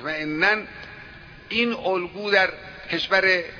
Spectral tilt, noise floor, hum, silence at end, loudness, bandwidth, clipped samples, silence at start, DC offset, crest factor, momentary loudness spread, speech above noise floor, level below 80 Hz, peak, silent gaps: -4.5 dB/octave; -43 dBFS; none; 0 s; -22 LUFS; 5.4 kHz; under 0.1%; 0 s; under 0.1%; 20 dB; 20 LU; 20 dB; -54 dBFS; -4 dBFS; none